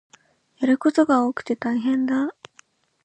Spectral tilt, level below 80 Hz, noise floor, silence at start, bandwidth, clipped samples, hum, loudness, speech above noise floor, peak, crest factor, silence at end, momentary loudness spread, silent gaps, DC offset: -5.5 dB/octave; -72 dBFS; -57 dBFS; 0.6 s; 8.8 kHz; under 0.1%; none; -22 LUFS; 36 dB; -8 dBFS; 16 dB; 0.75 s; 8 LU; none; under 0.1%